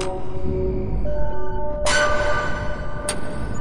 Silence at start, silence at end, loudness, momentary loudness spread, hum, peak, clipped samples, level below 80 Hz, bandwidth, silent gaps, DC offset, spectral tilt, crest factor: 0 s; 0 s; -24 LUFS; 10 LU; none; -8 dBFS; under 0.1%; -30 dBFS; 11.5 kHz; none; under 0.1%; -4 dB/octave; 12 dB